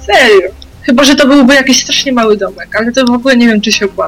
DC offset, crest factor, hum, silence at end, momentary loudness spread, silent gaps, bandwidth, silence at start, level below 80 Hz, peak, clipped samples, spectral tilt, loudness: under 0.1%; 8 dB; none; 0 s; 9 LU; none; 16.5 kHz; 0 s; -36 dBFS; 0 dBFS; 0.4%; -3 dB/octave; -7 LUFS